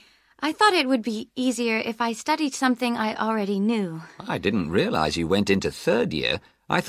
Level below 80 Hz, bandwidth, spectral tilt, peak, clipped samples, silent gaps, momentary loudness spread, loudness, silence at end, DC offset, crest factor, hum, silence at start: -50 dBFS; 15 kHz; -4.5 dB/octave; -4 dBFS; under 0.1%; none; 8 LU; -24 LUFS; 0 s; under 0.1%; 20 dB; none; 0.4 s